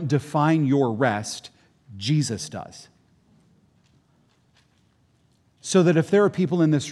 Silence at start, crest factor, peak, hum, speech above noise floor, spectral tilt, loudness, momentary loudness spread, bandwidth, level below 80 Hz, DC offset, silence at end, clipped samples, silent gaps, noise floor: 0 s; 18 dB; -6 dBFS; none; 42 dB; -6 dB/octave; -22 LUFS; 16 LU; 12 kHz; -68 dBFS; under 0.1%; 0 s; under 0.1%; none; -63 dBFS